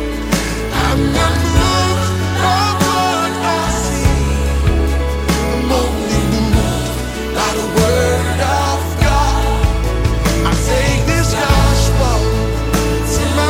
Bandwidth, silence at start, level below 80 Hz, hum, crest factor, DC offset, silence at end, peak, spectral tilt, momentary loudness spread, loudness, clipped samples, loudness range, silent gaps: 16.5 kHz; 0 s; -18 dBFS; none; 14 dB; under 0.1%; 0 s; 0 dBFS; -5 dB/octave; 4 LU; -15 LUFS; under 0.1%; 2 LU; none